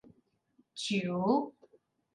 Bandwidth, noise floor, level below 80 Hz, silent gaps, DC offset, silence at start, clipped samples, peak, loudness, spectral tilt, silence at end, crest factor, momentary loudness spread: 11 kHz; -71 dBFS; -78 dBFS; none; under 0.1%; 0.75 s; under 0.1%; -18 dBFS; -32 LUFS; -5.5 dB/octave; 0.65 s; 18 dB; 15 LU